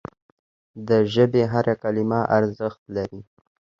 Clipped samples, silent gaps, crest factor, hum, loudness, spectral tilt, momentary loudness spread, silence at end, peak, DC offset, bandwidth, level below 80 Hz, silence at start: under 0.1%; 2.79-2.86 s; 18 dB; none; -22 LUFS; -8 dB/octave; 13 LU; 0.6 s; -4 dBFS; under 0.1%; 7.2 kHz; -56 dBFS; 0.75 s